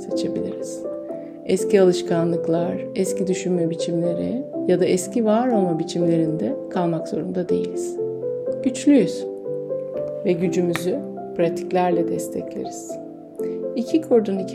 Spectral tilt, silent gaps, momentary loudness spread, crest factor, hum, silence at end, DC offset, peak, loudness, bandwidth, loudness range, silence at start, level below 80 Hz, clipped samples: -6.5 dB/octave; none; 12 LU; 18 dB; none; 0 s; under 0.1%; -4 dBFS; -22 LUFS; 15.5 kHz; 2 LU; 0 s; -64 dBFS; under 0.1%